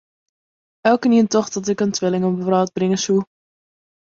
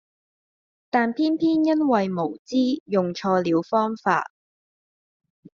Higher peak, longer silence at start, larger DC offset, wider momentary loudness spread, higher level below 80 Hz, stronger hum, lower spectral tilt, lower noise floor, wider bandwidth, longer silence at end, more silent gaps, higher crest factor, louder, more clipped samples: first, -2 dBFS vs -6 dBFS; about the same, 0.85 s vs 0.95 s; neither; about the same, 6 LU vs 5 LU; first, -62 dBFS vs -68 dBFS; neither; about the same, -5.5 dB/octave vs -5 dB/octave; about the same, under -90 dBFS vs under -90 dBFS; about the same, 7.8 kHz vs 7.2 kHz; second, 0.9 s vs 1.35 s; second, none vs 2.39-2.45 s, 2.80-2.86 s; about the same, 18 dB vs 18 dB; first, -19 LUFS vs -23 LUFS; neither